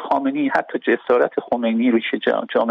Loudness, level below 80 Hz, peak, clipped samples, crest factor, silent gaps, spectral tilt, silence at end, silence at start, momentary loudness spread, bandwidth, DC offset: -19 LUFS; -64 dBFS; -4 dBFS; under 0.1%; 16 dB; none; -7 dB/octave; 0 s; 0 s; 3 LU; 6 kHz; under 0.1%